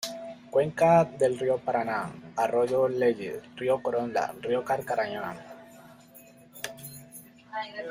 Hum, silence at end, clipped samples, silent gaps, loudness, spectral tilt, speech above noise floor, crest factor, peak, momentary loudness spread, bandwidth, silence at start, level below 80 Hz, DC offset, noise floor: none; 0 s; under 0.1%; none; -28 LUFS; -5.5 dB/octave; 26 dB; 18 dB; -10 dBFS; 20 LU; 16 kHz; 0 s; -68 dBFS; under 0.1%; -53 dBFS